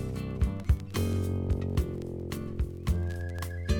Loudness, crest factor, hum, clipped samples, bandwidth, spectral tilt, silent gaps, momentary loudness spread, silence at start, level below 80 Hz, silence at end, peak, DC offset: -32 LUFS; 18 dB; none; under 0.1%; 18.5 kHz; -7 dB/octave; none; 6 LU; 0 s; -34 dBFS; 0 s; -12 dBFS; under 0.1%